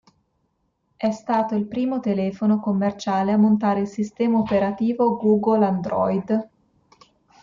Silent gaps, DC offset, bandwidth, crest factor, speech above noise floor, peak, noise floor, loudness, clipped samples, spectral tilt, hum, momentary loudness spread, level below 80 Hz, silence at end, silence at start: none; under 0.1%; 7.4 kHz; 14 dB; 50 dB; -8 dBFS; -70 dBFS; -22 LUFS; under 0.1%; -8 dB/octave; none; 7 LU; -60 dBFS; 0.95 s; 1 s